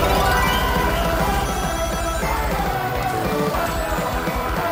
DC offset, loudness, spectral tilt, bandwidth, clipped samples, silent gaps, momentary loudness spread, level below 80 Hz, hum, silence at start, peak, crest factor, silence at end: under 0.1%; -21 LUFS; -4.5 dB/octave; 16 kHz; under 0.1%; none; 5 LU; -28 dBFS; none; 0 s; -6 dBFS; 16 dB; 0 s